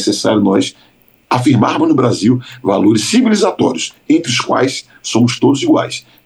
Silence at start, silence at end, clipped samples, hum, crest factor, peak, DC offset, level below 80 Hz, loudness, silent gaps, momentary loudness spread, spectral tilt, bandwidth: 0 s; 0.25 s; under 0.1%; none; 12 dB; -2 dBFS; under 0.1%; -56 dBFS; -13 LUFS; none; 7 LU; -5 dB/octave; 12.5 kHz